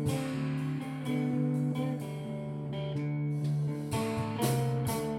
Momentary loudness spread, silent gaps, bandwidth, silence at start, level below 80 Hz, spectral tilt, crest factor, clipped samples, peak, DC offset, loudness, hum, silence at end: 7 LU; none; 16 kHz; 0 s; -60 dBFS; -6.5 dB/octave; 16 dB; under 0.1%; -16 dBFS; under 0.1%; -33 LUFS; none; 0 s